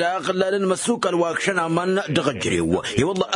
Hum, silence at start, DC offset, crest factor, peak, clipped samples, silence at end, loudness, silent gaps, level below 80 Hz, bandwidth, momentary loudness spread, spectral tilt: none; 0 s; under 0.1%; 16 dB; -4 dBFS; under 0.1%; 0 s; -21 LUFS; none; -52 dBFS; 11 kHz; 1 LU; -4.5 dB/octave